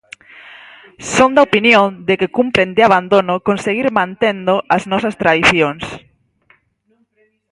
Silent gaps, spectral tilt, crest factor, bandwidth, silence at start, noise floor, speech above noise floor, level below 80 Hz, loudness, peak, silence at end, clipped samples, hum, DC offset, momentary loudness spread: none; -4.5 dB/octave; 16 dB; 11.5 kHz; 0.45 s; -61 dBFS; 47 dB; -48 dBFS; -13 LUFS; 0 dBFS; 1.55 s; under 0.1%; none; under 0.1%; 8 LU